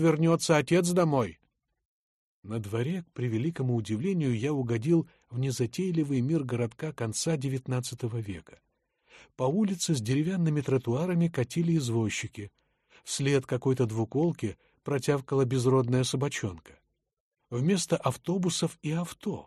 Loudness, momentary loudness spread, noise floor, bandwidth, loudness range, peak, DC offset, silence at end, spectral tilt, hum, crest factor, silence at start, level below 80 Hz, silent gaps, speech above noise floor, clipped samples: -29 LUFS; 10 LU; -66 dBFS; 13 kHz; 4 LU; -10 dBFS; under 0.1%; 0.05 s; -6 dB/octave; none; 18 dB; 0 s; -64 dBFS; 1.85-2.43 s, 17.20-17.32 s; 38 dB; under 0.1%